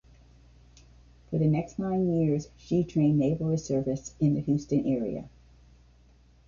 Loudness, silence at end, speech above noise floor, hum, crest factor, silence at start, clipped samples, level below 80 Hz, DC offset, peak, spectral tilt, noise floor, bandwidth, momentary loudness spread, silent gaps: -28 LUFS; 1.2 s; 31 dB; none; 16 dB; 1.3 s; under 0.1%; -54 dBFS; under 0.1%; -14 dBFS; -8.5 dB/octave; -58 dBFS; 7.2 kHz; 7 LU; none